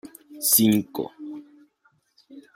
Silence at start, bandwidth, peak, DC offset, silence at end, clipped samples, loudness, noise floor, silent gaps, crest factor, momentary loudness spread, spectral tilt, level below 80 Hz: 0.05 s; 16.5 kHz; -4 dBFS; under 0.1%; 0.15 s; under 0.1%; -21 LUFS; -66 dBFS; none; 24 dB; 24 LU; -3.5 dB/octave; -68 dBFS